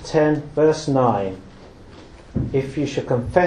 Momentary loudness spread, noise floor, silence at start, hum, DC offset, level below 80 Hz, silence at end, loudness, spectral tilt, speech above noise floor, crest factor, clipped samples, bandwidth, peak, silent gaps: 10 LU; -42 dBFS; 0 s; none; under 0.1%; -42 dBFS; 0 s; -21 LUFS; -7 dB/octave; 23 dB; 18 dB; under 0.1%; 10.5 kHz; -2 dBFS; none